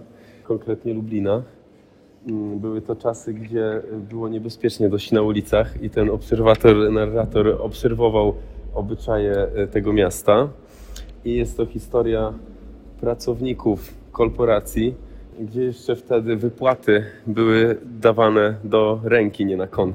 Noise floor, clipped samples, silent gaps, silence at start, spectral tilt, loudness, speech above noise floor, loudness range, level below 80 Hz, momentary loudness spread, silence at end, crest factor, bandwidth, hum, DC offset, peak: -51 dBFS; under 0.1%; none; 0 s; -7 dB/octave; -21 LUFS; 31 dB; 8 LU; -36 dBFS; 12 LU; 0 s; 20 dB; 16.5 kHz; none; under 0.1%; 0 dBFS